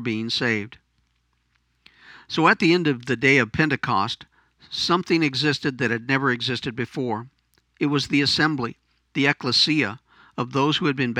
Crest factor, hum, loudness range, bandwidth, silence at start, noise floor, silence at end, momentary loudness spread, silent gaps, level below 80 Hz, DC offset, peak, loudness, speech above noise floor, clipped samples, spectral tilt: 20 dB; none; 3 LU; 11.5 kHz; 0 s; -69 dBFS; 0 s; 12 LU; none; -60 dBFS; under 0.1%; -2 dBFS; -22 LUFS; 47 dB; under 0.1%; -5 dB/octave